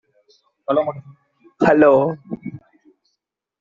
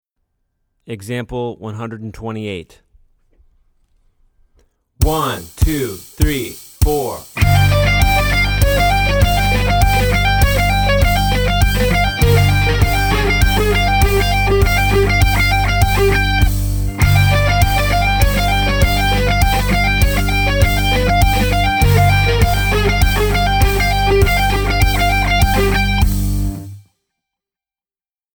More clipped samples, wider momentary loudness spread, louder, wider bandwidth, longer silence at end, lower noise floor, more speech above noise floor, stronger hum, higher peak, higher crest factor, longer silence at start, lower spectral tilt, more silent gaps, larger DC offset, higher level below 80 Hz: neither; first, 21 LU vs 11 LU; second, -17 LUFS vs -14 LUFS; second, 7.4 kHz vs over 20 kHz; second, 1.05 s vs 1.55 s; second, -77 dBFS vs under -90 dBFS; second, 61 dB vs over 71 dB; neither; about the same, -2 dBFS vs 0 dBFS; about the same, 18 dB vs 14 dB; second, 0.7 s vs 0.9 s; first, -6.5 dB/octave vs -5 dB/octave; neither; neither; second, -58 dBFS vs -18 dBFS